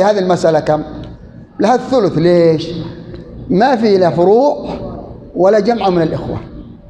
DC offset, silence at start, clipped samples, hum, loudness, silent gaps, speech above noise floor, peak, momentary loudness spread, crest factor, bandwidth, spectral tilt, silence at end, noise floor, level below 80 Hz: under 0.1%; 0 s; under 0.1%; none; -13 LUFS; none; 22 dB; 0 dBFS; 20 LU; 12 dB; 9.4 kHz; -7 dB/octave; 0.15 s; -34 dBFS; -40 dBFS